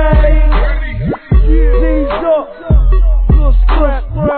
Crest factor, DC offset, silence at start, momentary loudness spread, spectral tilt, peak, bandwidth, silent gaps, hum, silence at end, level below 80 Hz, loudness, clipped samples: 8 dB; under 0.1%; 0 s; 6 LU; -11.5 dB/octave; 0 dBFS; 4.3 kHz; none; none; 0 s; -10 dBFS; -13 LUFS; under 0.1%